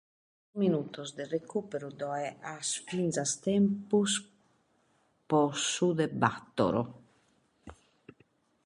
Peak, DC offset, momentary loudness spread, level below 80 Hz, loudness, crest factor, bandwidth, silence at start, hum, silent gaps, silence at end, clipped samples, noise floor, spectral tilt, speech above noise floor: -10 dBFS; under 0.1%; 10 LU; -68 dBFS; -31 LUFS; 22 dB; 11.5 kHz; 0.55 s; none; none; 0.9 s; under 0.1%; -71 dBFS; -4.5 dB/octave; 40 dB